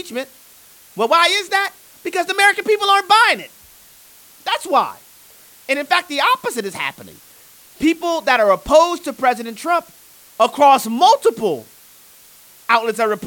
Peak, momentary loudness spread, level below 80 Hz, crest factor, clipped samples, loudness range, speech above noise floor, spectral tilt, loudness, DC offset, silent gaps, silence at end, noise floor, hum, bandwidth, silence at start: 0 dBFS; 15 LU; -52 dBFS; 18 dB; under 0.1%; 5 LU; 30 dB; -2 dB/octave; -16 LUFS; under 0.1%; none; 0 s; -46 dBFS; none; 19 kHz; 0.05 s